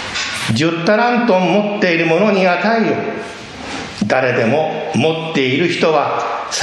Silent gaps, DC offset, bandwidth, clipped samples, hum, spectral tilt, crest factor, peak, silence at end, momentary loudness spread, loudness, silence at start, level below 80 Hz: none; under 0.1%; 13 kHz; under 0.1%; none; -5 dB/octave; 14 dB; 0 dBFS; 0 s; 10 LU; -15 LUFS; 0 s; -52 dBFS